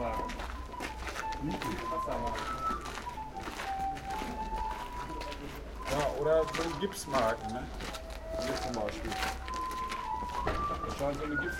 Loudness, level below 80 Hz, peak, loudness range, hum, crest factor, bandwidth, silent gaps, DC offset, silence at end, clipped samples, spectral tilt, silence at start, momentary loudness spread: -35 LUFS; -44 dBFS; -16 dBFS; 4 LU; none; 20 dB; 17 kHz; none; under 0.1%; 0 s; under 0.1%; -4.5 dB/octave; 0 s; 10 LU